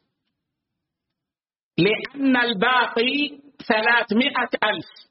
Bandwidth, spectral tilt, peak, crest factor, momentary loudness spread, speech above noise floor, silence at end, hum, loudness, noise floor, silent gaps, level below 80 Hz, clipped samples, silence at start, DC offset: 5.8 kHz; -2 dB/octave; -4 dBFS; 18 dB; 6 LU; over 69 dB; 0.25 s; none; -21 LUFS; under -90 dBFS; none; -64 dBFS; under 0.1%; 1.8 s; under 0.1%